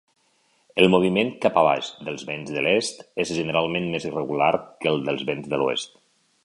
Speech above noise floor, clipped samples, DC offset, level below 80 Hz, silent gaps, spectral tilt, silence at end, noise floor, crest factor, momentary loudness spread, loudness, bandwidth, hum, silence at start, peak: 42 dB; under 0.1%; under 0.1%; -60 dBFS; none; -5 dB/octave; 0.55 s; -65 dBFS; 22 dB; 11 LU; -23 LUFS; 11.5 kHz; none; 0.75 s; -2 dBFS